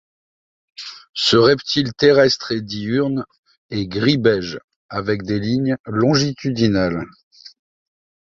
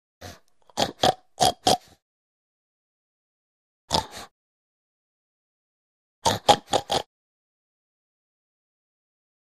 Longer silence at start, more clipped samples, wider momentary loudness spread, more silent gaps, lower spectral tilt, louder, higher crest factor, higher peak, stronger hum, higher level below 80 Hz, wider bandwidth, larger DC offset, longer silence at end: first, 0.8 s vs 0.2 s; neither; second, 16 LU vs 22 LU; second, 1.09-1.14 s, 3.38-3.43 s, 3.58-3.69 s, 4.64-4.68 s, 4.76-4.89 s, 5.80-5.84 s, 7.23-7.31 s vs 2.02-3.88 s, 4.31-6.22 s; first, -5.5 dB/octave vs -2.5 dB/octave; first, -18 LUFS vs -24 LUFS; second, 18 dB vs 28 dB; about the same, -2 dBFS vs -2 dBFS; neither; about the same, -50 dBFS vs -54 dBFS; second, 7.8 kHz vs 15.5 kHz; neither; second, 0.8 s vs 2.55 s